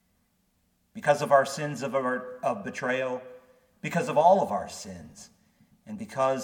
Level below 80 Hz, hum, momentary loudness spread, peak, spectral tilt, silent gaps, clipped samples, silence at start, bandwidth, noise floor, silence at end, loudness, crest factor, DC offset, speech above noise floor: -70 dBFS; none; 20 LU; -8 dBFS; -5 dB/octave; none; under 0.1%; 0.95 s; 17 kHz; -71 dBFS; 0 s; -27 LUFS; 20 dB; under 0.1%; 44 dB